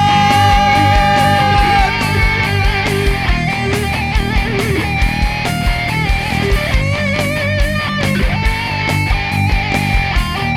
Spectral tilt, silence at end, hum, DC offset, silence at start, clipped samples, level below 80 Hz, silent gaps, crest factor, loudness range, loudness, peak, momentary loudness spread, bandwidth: -5 dB/octave; 0 s; none; under 0.1%; 0 s; under 0.1%; -20 dBFS; none; 12 dB; 4 LU; -14 LUFS; -2 dBFS; 6 LU; 16 kHz